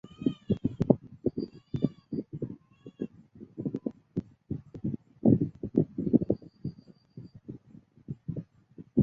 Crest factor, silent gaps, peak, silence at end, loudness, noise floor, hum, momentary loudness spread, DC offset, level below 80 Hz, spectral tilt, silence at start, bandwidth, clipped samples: 26 dB; none; -6 dBFS; 0 s; -32 LUFS; -56 dBFS; none; 22 LU; under 0.1%; -54 dBFS; -11.5 dB/octave; 0.05 s; 5 kHz; under 0.1%